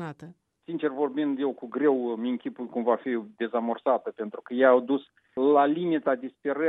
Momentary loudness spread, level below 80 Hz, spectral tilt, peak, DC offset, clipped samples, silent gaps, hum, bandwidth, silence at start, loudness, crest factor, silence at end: 12 LU; -82 dBFS; -8.5 dB/octave; -8 dBFS; under 0.1%; under 0.1%; none; none; 4 kHz; 0 s; -27 LUFS; 20 dB; 0 s